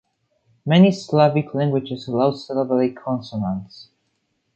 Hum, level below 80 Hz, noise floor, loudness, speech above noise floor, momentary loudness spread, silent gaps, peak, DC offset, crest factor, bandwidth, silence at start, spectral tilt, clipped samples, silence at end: none; -58 dBFS; -71 dBFS; -20 LUFS; 51 dB; 12 LU; none; -2 dBFS; under 0.1%; 18 dB; 7.8 kHz; 0.65 s; -7.5 dB/octave; under 0.1%; 0.75 s